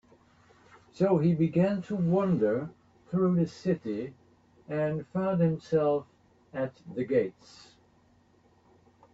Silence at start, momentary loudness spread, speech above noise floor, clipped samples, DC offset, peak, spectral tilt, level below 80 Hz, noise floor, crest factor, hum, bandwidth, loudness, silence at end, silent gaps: 0.95 s; 11 LU; 36 dB; under 0.1%; under 0.1%; -14 dBFS; -9 dB/octave; -66 dBFS; -64 dBFS; 16 dB; none; 7.6 kHz; -29 LUFS; 1.85 s; none